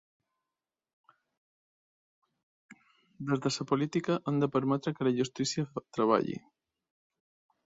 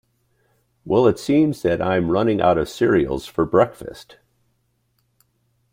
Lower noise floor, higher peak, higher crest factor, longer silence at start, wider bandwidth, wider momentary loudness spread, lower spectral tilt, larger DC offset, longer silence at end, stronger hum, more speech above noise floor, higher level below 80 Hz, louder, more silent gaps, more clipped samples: first, under -90 dBFS vs -68 dBFS; second, -12 dBFS vs -2 dBFS; about the same, 22 dB vs 18 dB; first, 3.2 s vs 0.85 s; second, 8 kHz vs 16 kHz; about the same, 8 LU vs 6 LU; second, -5.5 dB/octave vs -7 dB/octave; neither; second, 1.3 s vs 1.7 s; neither; first, over 60 dB vs 49 dB; second, -72 dBFS vs -48 dBFS; second, -31 LUFS vs -19 LUFS; neither; neither